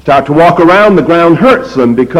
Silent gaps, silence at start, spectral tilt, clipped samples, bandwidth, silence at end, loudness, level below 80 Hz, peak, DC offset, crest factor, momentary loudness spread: none; 0.05 s; -7.5 dB/octave; 0.4%; 12.5 kHz; 0 s; -6 LUFS; -38 dBFS; 0 dBFS; under 0.1%; 6 dB; 5 LU